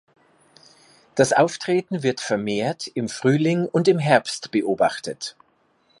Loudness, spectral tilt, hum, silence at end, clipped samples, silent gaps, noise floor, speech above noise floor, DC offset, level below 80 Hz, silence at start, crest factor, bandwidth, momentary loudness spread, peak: -22 LUFS; -5 dB/octave; none; 0.7 s; under 0.1%; none; -63 dBFS; 42 dB; under 0.1%; -66 dBFS; 1.15 s; 20 dB; 11.5 kHz; 11 LU; -2 dBFS